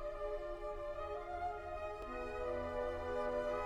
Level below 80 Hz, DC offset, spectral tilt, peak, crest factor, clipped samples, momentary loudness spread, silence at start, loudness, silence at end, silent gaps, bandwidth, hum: -52 dBFS; under 0.1%; -6 dB/octave; -28 dBFS; 14 dB; under 0.1%; 6 LU; 0 s; -43 LUFS; 0 s; none; 12.5 kHz; none